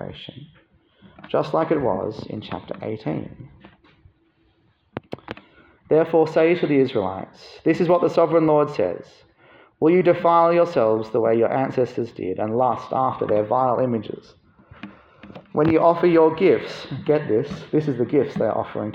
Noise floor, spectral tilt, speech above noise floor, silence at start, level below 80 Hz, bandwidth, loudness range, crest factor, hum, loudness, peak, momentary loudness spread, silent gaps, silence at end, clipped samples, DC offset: -62 dBFS; -8.5 dB/octave; 42 dB; 0 s; -58 dBFS; 7.6 kHz; 8 LU; 18 dB; none; -20 LUFS; -4 dBFS; 19 LU; none; 0 s; under 0.1%; under 0.1%